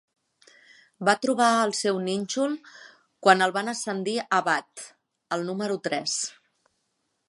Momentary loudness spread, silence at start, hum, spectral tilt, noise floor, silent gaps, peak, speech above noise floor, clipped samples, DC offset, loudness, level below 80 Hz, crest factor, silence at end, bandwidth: 12 LU; 1 s; none; -3 dB/octave; -76 dBFS; none; -2 dBFS; 51 dB; under 0.1%; under 0.1%; -25 LUFS; -80 dBFS; 26 dB; 1 s; 11.5 kHz